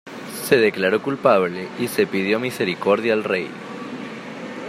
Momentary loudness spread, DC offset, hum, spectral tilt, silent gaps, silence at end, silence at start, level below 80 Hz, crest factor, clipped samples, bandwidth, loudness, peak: 15 LU; under 0.1%; none; -5 dB/octave; none; 0 s; 0.05 s; -68 dBFS; 20 dB; under 0.1%; 16 kHz; -20 LUFS; -2 dBFS